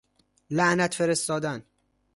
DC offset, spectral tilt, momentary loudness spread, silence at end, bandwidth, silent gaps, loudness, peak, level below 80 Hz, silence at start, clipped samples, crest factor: under 0.1%; -4 dB/octave; 10 LU; 0.55 s; 12 kHz; none; -25 LUFS; -8 dBFS; -64 dBFS; 0.5 s; under 0.1%; 18 dB